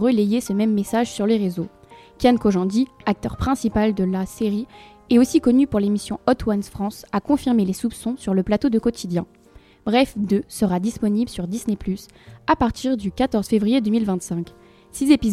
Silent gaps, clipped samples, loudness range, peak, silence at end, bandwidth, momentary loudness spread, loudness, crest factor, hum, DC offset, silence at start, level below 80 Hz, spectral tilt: none; under 0.1%; 3 LU; -2 dBFS; 0 s; 15 kHz; 10 LU; -21 LUFS; 18 dB; none; under 0.1%; 0 s; -42 dBFS; -6 dB/octave